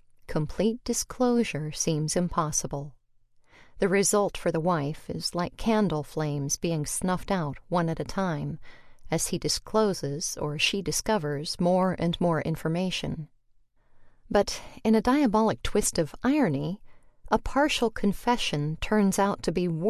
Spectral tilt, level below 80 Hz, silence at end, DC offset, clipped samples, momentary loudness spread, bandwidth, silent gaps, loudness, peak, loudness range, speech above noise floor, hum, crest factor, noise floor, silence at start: -4.5 dB/octave; -48 dBFS; 0 s; under 0.1%; under 0.1%; 8 LU; 14.5 kHz; none; -27 LUFS; -10 dBFS; 3 LU; 35 dB; none; 18 dB; -62 dBFS; 0.3 s